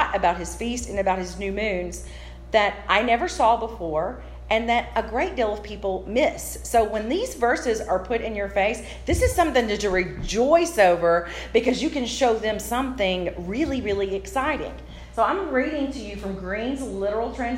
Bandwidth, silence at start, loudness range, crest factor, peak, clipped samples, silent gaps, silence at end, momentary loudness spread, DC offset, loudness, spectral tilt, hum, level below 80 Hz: 16 kHz; 0 s; 4 LU; 18 dB; -4 dBFS; under 0.1%; none; 0 s; 9 LU; under 0.1%; -24 LUFS; -4.5 dB/octave; none; -38 dBFS